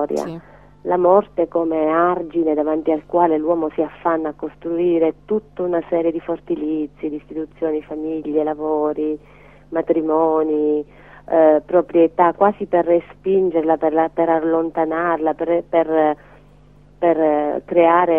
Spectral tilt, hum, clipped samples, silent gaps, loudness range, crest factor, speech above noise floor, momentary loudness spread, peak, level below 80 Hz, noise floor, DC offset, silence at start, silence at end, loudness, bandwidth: -8 dB/octave; 50 Hz at -50 dBFS; under 0.1%; none; 6 LU; 18 dB; 30 dB; 10 LU; 0 dBFS; -52 dBFS; -48 dBFS; 0.2%; 0 s; 0 s; -19 LUFS; 7.2 kHz